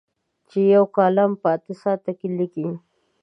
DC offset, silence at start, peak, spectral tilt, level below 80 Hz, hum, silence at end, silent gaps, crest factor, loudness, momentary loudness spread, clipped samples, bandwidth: under 0.1%; 0.55 s; -4 dBFS; -9.5 dB/octave; -76 dBFS; none; 0.45 s; none; 18 dB; -21 LUFS; 13 LU; under 0.1%; 5.8 kHz